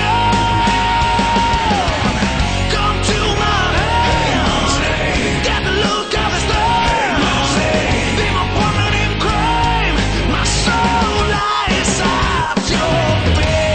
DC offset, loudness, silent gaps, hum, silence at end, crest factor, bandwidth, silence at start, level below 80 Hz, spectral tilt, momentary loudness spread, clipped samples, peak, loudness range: under 0.1%; -15 LUFS; none; none; 0 s; 12 dB; 9.2 kHz; 0 s; -24 dBFS; -4 dB/octave; 2 LU; under 0.1%; -4 dBFS; 0 LU